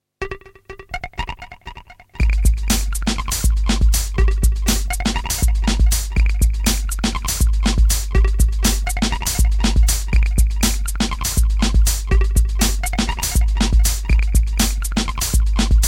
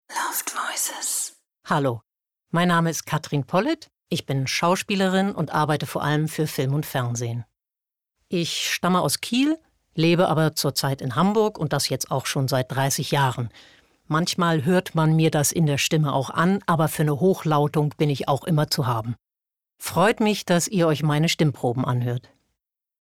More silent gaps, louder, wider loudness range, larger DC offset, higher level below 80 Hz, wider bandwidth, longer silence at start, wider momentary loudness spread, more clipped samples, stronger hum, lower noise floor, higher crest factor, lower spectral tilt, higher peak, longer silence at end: neither; first, -19 LUFS vs -23 LUFS; about the same, 2 LU vs 4 LU; neither; first, -18 dBFS vs -60 dBFS; about the same, 17 kHz vs 17 kHz; about the same, 0.2 s vs 0.1 s; first, 11 LU vs 7 LU; neither; neither; second, -39 dBFS vs -87 dBFS; about the same, 14 dB vs 14 dB; about the same, -4 dB/octave vs -5 dB/octave; first, -2 dBFS vs -8 dBFS; second, 0 s vs 0.8 s